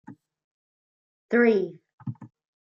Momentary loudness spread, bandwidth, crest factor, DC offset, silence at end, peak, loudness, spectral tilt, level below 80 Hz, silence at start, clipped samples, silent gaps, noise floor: 19 LU; 6.8 kHz; 20 dB; under 0.1%; 0.35 s; -8 dBFS; -23 LUFS; -8.5 dB/octave; -78 dBFS; 0.1 s; under 0.1%; 0.44-1.29 s, 1.93-1.98 s; under -90 dBFS